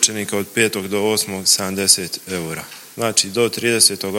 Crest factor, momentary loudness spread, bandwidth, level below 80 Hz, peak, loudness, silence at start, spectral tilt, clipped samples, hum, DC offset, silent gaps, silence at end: 20 dB; 12 LU; 17 kHz; -62 dBFS; 0 dBFS; -17 LUFS; 0 s; -2 dB/octave; under 0.1%; none; under 0.1%; none; 0 s